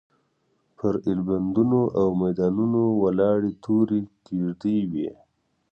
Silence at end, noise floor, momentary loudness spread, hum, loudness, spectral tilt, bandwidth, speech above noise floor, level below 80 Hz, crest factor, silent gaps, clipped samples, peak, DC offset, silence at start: 0.6 s; -69 dBFS; 8 LU; none; -24 LUFS; -10.5 dB/octave; 6.6 kHz; 47 dB; -54 dBFS; 14 dB; none; under 0.1%; -10 dBFS; under 0.1%; 0.85 s